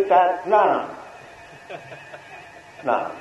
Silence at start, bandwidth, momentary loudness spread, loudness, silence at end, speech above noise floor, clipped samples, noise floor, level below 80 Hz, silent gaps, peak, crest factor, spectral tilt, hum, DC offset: 0 s; 11 kHz; 24 LU; -20 LUFS; 0 s; 22 dB; under 0.1%; -43 dBFS; -66 dBFS; none; -4 dBFS; 18 dB; -5.5 dB/octave; none; under 0.1%